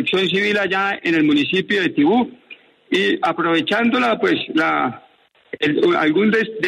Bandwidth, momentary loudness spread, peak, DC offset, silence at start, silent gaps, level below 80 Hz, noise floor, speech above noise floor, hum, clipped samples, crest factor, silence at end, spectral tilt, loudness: 11 kHz; 5 LU; -6 dBFS; under 0.1%; 0 s; none; -62 dBFS; -54 dBFS; 36 dB; none; under 0.1%; 12 dB; 0 s; -5.5 dB/octave; -17 LUFS